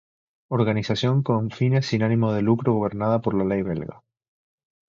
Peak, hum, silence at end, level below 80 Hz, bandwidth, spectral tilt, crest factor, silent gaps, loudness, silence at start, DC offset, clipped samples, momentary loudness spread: -6 dBFS; none; 0.95 s; -54 dBFS; 7.4 kHz; -7.5 dB/octave; 16 dB; none; -23 LUFS; 0.5 s; under 0.1%; under 0.1%; 6 LU